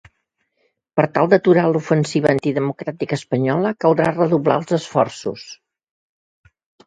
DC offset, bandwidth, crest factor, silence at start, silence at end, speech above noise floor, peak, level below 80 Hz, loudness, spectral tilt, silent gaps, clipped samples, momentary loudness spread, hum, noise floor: under 0.1%; 9.4 kHz; 18 dB; 0.95 s; 1.35 s; 53 dB; 0 dBFS; -60 dBFS; -18 LUFS; -7 dB/octave; none; under 0.1%; 10 LU; none; -71 dBFS